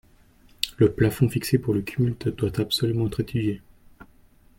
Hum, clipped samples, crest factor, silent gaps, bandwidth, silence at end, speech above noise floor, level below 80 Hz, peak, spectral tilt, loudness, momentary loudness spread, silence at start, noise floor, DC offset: none; under 0.1%; 22 dB; none; 16.5 kHz; 0.55 s; 32 dB; -48 dBFS; -4 dBFS; -6.5 dB/octave; -24 LUFS; 8 LU; 0.6 s; -55 dBFS; under 0.1%